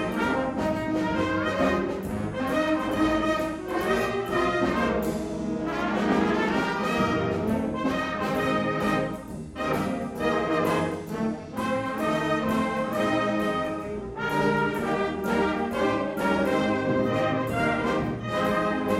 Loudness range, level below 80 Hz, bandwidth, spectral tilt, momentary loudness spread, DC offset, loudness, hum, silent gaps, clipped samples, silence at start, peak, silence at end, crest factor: 2 LU; -48 dBFS; 16.5 kHz; -6 dB/octave; 6 LU; under 0.1%; -26 LUFS; none; none; under 0.1%; 0 s; -10 dBFS; 0 s; 14 dB